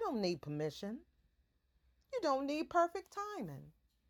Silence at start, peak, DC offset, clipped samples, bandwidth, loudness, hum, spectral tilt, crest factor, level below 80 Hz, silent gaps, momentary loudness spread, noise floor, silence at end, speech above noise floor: 0 s; -20 dBFS; under 0.1%; under 0.1%; 18.5 kHz; -39 LUFS; none; -5.5 dB/octave; 20 dB; -72 dBFS; none; 13 LU; -77 dBFS; 0.4 s; 38 dB